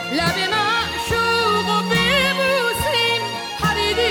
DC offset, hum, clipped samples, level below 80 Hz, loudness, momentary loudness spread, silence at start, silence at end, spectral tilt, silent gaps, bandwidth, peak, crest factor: under 0.1%; none; under 0.1%; -40 dBFS; -18 LUFS; 5 LU; 0 s; 0 s; -3.5 dB/octave; none; over 20 kHz; -6 dBFS; 14 dB